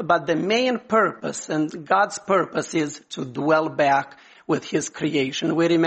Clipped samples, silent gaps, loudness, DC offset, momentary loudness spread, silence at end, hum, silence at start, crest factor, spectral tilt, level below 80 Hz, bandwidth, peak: under 0.1%; none; -22 LUFS; under 0.1%; 8 LU; 0 s; none; 0 s; 18 dB; -4.5 dB/octave; -66 dBFS; 8.8 kHz; -4 dBFS